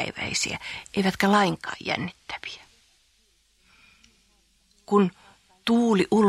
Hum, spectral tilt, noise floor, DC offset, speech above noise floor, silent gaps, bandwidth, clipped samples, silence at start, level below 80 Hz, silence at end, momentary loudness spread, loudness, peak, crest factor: none; -4.5 dB/octave; -65 dBFS; under 0.1%; 41 dB; none; 15 kHz; under 0.1%; 0 s; -58 dBFS; 0 s; 15 LU; -25 LUFS; -6 dBFS; 20 dB